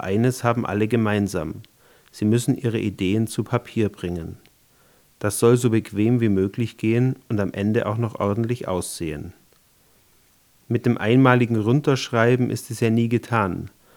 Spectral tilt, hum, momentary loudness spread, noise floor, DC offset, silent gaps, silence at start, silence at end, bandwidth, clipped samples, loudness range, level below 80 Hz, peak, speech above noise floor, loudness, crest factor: -6.5 dB/octave; none; 11 LU; -58 dBFS; under 0.1%; none; 0 s; 0.3 s; 18.5 kHz; under 0.1%; 6 LU; -58 dBFS; 0 dBFS; 37 dB; -22 LUFS; 22 dB